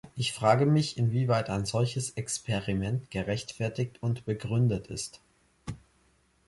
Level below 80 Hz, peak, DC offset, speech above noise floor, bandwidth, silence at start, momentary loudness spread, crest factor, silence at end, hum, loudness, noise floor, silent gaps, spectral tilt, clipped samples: -54 dBFS; -8 dBFS; under 0.1%; 38 dB; 11.5 kHz; 0.05 s; 14 LU; 20 dB; 0.7 s; none; -29 LUFS; -67 dBFS; none; -5.5 dB/octave; under 0.1%